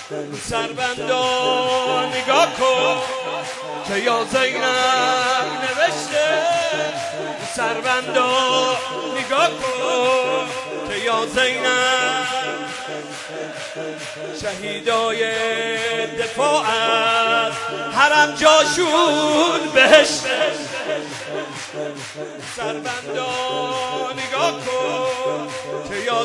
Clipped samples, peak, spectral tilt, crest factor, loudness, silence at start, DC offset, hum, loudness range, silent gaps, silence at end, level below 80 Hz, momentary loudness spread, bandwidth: under 0.1%; 0 dBFS; -2 dB/octave; 20 dB; -19 LUFS; 0 s; under 0.1%; none; 9 LU; none; 0 s; -58 dBFS; 12 LU; 11.5 kHz